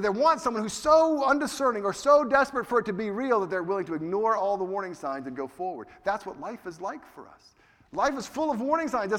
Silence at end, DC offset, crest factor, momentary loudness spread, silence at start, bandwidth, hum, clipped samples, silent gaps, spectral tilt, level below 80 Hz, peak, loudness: 0 s; under 0.1%; 18 dB; 15 LU; 0 s; 15.5 kHz; none; under 0.1%; none; -4.5 dB/octave; -60 dBFS; -10 dBFS; -26 LUFS